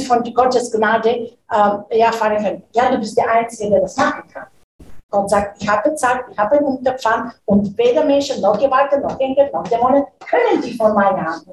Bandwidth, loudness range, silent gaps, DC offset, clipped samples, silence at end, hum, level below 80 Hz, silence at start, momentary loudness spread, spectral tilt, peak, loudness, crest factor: 12.5 kHz; 3 LU; 4.64-4.79 s, 5.03-5.09 s; under 0.1%; under 0.1%; 0 s; none; -48 dBFS; 0 s; 5 LU; -5 dB/octave; -2 dBFS; -16 LUFS; 16 dB